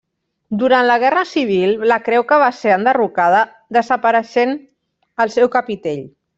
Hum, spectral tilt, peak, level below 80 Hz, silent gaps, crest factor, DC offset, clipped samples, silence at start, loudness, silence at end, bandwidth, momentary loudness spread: none; -5.5 dB/octave; -2 dBFS; -62 dBFS; none; 14 dB; under 0.1%; under 0.1%; 0.5 s; -15 LUFS; 0.3 s; 7.8 kHz; 10 LU